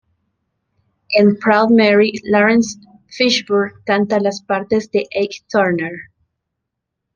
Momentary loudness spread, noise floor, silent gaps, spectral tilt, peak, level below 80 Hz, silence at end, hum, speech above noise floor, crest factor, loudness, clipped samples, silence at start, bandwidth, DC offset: 10 LU; -78 dBFS; none; -5 dB/octave; -2 dBFS; -58 dBFS; 1.15 s; none; 63 dB; 16 dB; -15 LUFS; under 0.1%; 1.1 s; 7.4 kHz; under 0.1%